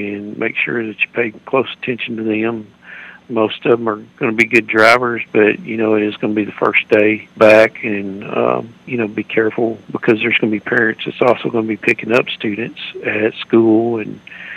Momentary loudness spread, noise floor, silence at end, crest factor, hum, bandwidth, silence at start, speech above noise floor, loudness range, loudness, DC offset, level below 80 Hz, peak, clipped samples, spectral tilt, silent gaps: 12 LU; -36 dBFS; 0 s; 16 dB; none; 12 kHz; 0 s; 21 dB; 5 LU; -15 LUFS; under 0.1%; -60 dBFS; 0 dBFS; 0.1%; -6 dB/octave; none